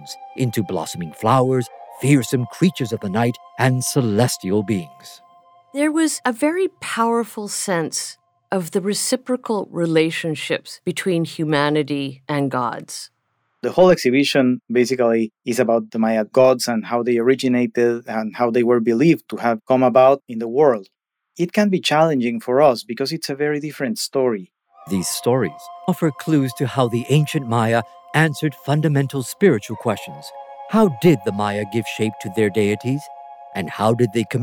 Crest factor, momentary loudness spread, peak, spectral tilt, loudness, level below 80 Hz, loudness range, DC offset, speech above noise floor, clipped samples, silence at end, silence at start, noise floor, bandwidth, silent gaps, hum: 16 dB; 10 LU; -2 dBFS; -5.5 dB/octave; -19 LUFS; -64 dBFS; 4 LU; under 0.1%; 50 dB; under 0.1%; 0 s; 0 s; -69 dBFS; over 20 kHz; none; none